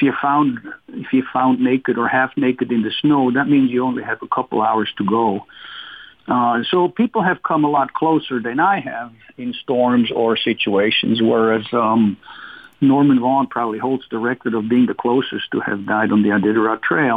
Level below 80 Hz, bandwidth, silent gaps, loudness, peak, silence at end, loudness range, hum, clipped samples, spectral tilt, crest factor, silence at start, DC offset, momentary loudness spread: -62 dBFS; 4.9 kHz; none; -17 LUFS; -6 dBFS; 0 s; 2 LU; none; under 0.1%; -8.5 dB/octave; 12 dB; 0 s; under 0.1%; 13 LU